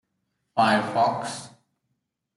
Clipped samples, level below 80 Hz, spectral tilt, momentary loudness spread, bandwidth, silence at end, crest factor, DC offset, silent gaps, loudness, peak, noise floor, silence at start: under 0.1%; -70 dBFS; -4.5 dB/octave; 13 LU; 11.5 kHz; 0.9 s; 18 dB; under 0.1%; none; -24 LUFS; -8 dBFS; -78 dBFS; 0.55 s